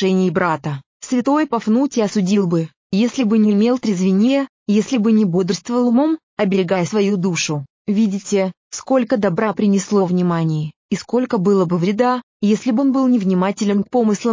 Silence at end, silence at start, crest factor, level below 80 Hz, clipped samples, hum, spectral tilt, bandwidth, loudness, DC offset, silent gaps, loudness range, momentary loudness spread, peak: 0 s; 0 s; 12 dB; -62 dBFS; under 0.1%; none; -6.5 dB/octave; 7.6 kHz; -17 LUFS; under 0.1%; 0.86-1.00 s, 2.76-2.90 s, 4.49-4.66 s, 6.23-6.37 s, 7.70-7.85 s, 8.57-8.71 s, 10.76-10.89 s, 12.23-12.40 s; 2 LU; 6 LU; -4 dBFS